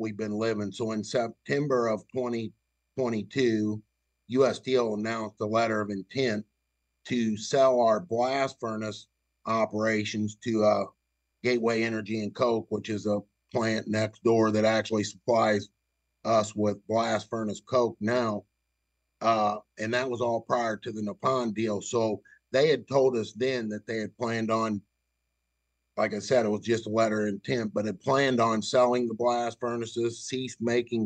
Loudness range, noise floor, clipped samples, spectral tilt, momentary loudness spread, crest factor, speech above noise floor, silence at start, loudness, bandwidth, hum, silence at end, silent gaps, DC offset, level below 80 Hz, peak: 3 LU; -80 dBFS; under 0.1%; -5.5 dB/octave; 9 LU; 18 dB; 52 dB; 0 s; -28 LUFS; 9.2 kHz; none; 0 s; none; under 0.1%; -72 dBFS; -10 dBFS